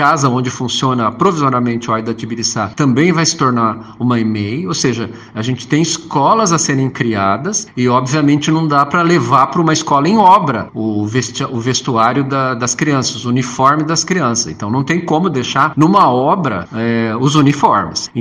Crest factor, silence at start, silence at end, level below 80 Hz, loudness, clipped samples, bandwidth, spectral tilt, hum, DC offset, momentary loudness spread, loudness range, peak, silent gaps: 14 dB; 0 s; 0 s; -52 dBFS; -14 LUFS; under 0.1%; 10.5 kHz; -5 dB/octave; none; under 0.1%; 7 LU; 3 LU; 0 dBFS; none